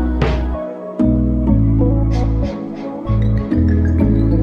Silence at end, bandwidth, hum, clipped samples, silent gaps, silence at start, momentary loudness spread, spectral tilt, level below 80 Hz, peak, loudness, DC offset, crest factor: 0 s; 6.6 kHz; none; under 0.1%; none; 0 s; 10 LU; -10 dB/octave; -20 dBFS; -2 dBFS; -17 LUFS; under 0.1%; 12 dB